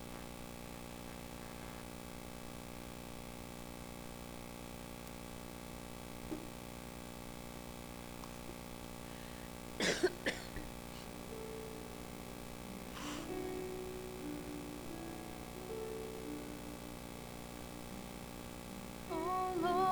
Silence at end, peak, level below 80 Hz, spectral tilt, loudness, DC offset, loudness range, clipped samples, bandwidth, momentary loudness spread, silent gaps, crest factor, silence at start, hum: 0 s; -22 dBFS; -58 dBFS; -4 dB/octave; -45 LUFS; under 0.1%; 7 LU; under 0.1%; over 20 kHz; 11 LU; none; 22 dB; 0 s; 60 Hz at -55 dBFS